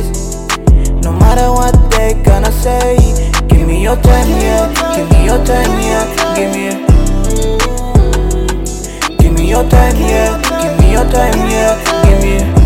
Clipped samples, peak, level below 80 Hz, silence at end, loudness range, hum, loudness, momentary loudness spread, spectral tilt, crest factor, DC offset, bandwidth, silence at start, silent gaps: 1%; 0 dBFS; -12 dBFS; 0 s; 2 LU; none; -11 LUFS; 5 LU; -5.5 dB/octave; 8 dB; under 0.1%; 16.5 kHz; 0 s; none